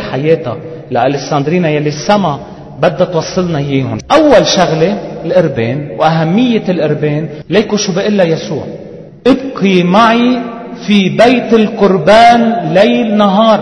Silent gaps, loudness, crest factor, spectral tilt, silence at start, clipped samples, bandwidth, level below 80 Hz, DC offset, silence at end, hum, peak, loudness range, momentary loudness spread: none; -10 LUFS; 10 dB; -6 dB/octave; 0 s; 0.6%; 10.5 kHz; -42 dBFS; 0.2%; 0 s; none; 0 dBFS; 5 LU; 11 LU